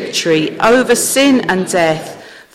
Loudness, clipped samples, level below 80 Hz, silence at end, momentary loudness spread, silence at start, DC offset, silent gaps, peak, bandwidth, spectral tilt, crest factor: -12 LUFS; under 0.1%; -50 dBFS; 0.15 s; 6 LU; 0 s; under 0.1%; none; -2 dBFS; 16.5 kHz; -3.5 dB/octave; 10 dB